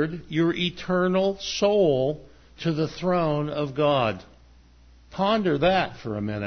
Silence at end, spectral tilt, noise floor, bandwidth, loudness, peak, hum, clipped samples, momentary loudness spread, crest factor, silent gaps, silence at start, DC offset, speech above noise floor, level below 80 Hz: 0 s; -6 dB/octave; -53 dBFS; 6.6 kHz; -24 LUFS; -8 dBFS; none; under 0.1%; 9 LU; 16 dB; none; 0 s; under 0.1%; 29 dB; -52 dBFS